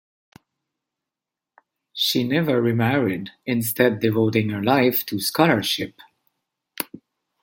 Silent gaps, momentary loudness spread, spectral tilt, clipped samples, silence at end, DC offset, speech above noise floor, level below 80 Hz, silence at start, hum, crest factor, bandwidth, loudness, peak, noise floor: none; 13 LU; -5 dB/octave; under 0.1%; 0.45 s; under 0.1%; 67 dB; -64 dBFS; 1.95 s; none; 22 dB; 17 kHz; -21 LUFS; 0 dBFS; -87 dBFS